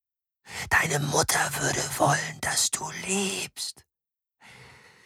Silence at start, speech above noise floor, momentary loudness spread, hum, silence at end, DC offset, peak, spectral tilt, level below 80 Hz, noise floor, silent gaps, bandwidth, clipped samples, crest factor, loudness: 0.45 s; 63 dB; 11 LU; none; 0.35 s; under 0.1%; -8 dBFS; -2.5 dB/octave; -54 dBFS; -90 dBFS; none; 18 kHz; under 0.1%; 20 dB; -25 LUFS